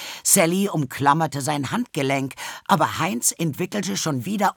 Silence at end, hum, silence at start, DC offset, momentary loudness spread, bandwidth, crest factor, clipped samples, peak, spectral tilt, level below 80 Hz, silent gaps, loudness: 0.05 s; none; 0 s; under 0.1%; 9 LU; over 20 kHz; 20 dB; under 0.1%; -2 dBFS; -3.5 dB/octave; -66 dBFS; none; -22 LUFS